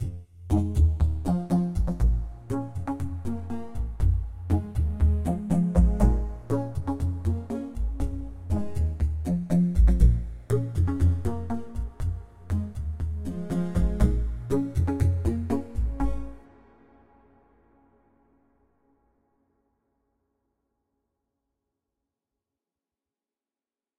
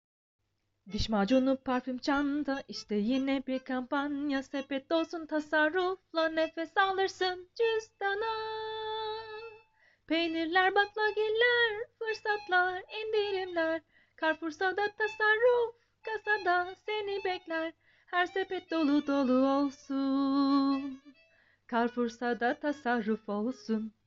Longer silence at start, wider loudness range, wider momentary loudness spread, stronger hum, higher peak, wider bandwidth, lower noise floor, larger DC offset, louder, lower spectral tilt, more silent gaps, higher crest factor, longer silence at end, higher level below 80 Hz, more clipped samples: second, 0 s vs 0.85 s; about the same, 5 LU vs 3 LU; about the same, 11 LU vs 9 LU; neither; first, -6 dBFS vs -12 dBFS; first, 11.5 kHz vs 7.6 kHz; first, under -90 dBFS vs -66 dBFS; neither; first, -27 LUFS vs -31 LUFS; first, -9 dB/octave vs -2 dB/octave; neither; about the same, 20 dB vs 18 dB; first, 7.6 s vs 0.15 s; first, -30 dBFS vs -60 dBFS; neither